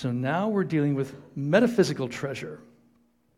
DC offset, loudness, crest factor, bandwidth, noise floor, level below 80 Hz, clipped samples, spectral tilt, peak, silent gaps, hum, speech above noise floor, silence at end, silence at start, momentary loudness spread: under 0.1%; -26 LUFS; 20 dB; 15 kHz; -65 dBFS; -64 dBFS; under 0.1%; -6.5 dB/octave; -8 dBFS; none; none; 39 dB; 0.75 s; 0 s; 14 LU